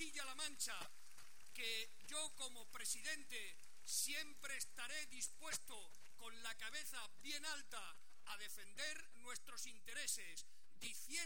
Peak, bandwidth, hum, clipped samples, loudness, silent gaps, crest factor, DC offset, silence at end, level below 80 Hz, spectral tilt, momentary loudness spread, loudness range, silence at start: -28 dBFS; 17 kHz; none; under 0.1%; -48 LUFS; none; 22 dB; 0.4%; 0 s; -82 dBFS; 0.5 dB/octave; 13 LU; 4 LU; 0 s